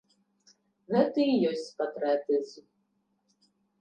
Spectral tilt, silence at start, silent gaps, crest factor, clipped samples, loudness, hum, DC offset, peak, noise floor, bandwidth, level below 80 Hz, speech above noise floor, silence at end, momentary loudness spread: -6.5 dB/octave; 0.9 s; none; 20 dB; under 0.1%; -28 LUFS; none; under 0.1%; -12 dBFS; -75 dBFS; 9.2 kHz; -84 dBFS; 47 dB; 1.2 s; 8 LU